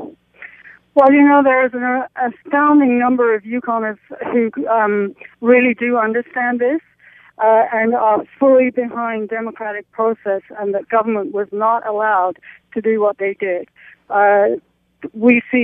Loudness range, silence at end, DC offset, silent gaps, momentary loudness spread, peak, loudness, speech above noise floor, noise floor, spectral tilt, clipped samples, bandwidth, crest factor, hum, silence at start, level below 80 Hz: 5 LU; 0 s; under 0.1%; none; 12 LU; 0 dBFS; -16 LUFS; 28 dB; -44 dBFS; -9 dB/octave; under 0.1%; 3.7 kHz; 16 dB; none; 0 s; -64 dBFS